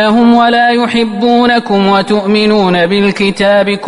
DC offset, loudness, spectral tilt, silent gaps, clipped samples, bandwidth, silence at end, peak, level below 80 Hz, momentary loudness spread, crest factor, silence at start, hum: under 0.1%; -9 LUFS; -6 dB/octave; none; under 0.1%; 11 kHz; 0 s; 0 dBFS; -44 dBFS; 4 LU; 8 dB; 0 s; none